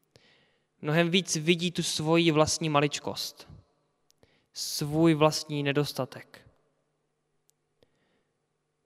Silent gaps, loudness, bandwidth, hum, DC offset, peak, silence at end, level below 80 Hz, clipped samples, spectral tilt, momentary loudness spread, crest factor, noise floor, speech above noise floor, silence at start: none; -27 LUFS; 15.5 kHz; none; under 0.1%; -6 dBFS; 2.5 s; -64 dBFS; under 0.1%; -4.5 dB/octave; 13 LU; 24 dB; -78 dBFS; 51 dB; 0.8 s